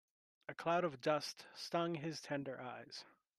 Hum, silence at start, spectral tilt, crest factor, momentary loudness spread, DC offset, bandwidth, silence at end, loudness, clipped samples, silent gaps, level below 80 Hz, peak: none; 0.5 s; -5 dB/octave; 20 dB; 15 LU; under 0.1%; 13.5 kHz; 0.3 s; -41 LUFS; under 0.1%; none; -86 dBFS; -22 dBFS